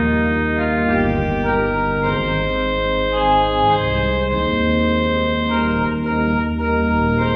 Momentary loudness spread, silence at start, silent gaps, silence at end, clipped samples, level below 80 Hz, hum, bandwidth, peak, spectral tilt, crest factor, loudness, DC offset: 3 LU; 0 s; none; 0 s; under 0.1%; -28 dBFS; none; 5.4 kHz; -4 dBFS; -8.5 dB/octave; 14 dB; -18 LUFS; under 0.1%